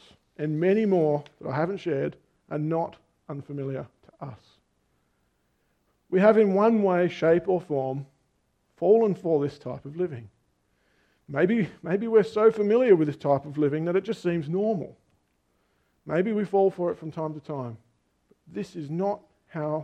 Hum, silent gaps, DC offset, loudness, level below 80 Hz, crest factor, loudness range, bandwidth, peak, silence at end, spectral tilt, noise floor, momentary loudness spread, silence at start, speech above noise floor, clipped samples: none; none; under 0.1%; -25 LUFS; -68 dBFS; 20 dB; 9 LU; 8.6 kHz; -6 dBFS; 0 s; -8.5 dB/octave; -71 dBFS; 16 LU; 0.4 s; 47 dB; under 0.1%